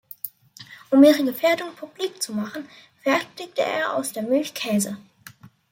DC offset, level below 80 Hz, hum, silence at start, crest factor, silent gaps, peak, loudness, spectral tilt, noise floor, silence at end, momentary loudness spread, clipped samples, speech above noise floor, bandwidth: under 0.1%; -72 dBFS; none; 0.25 s; 20 dB; none; -4 dBFS; -22 LUFS; -4 dB/octave; -48 dBFS; 0.7 s; 20 LU; under 0.1%; 26 dB; 16.5 kHz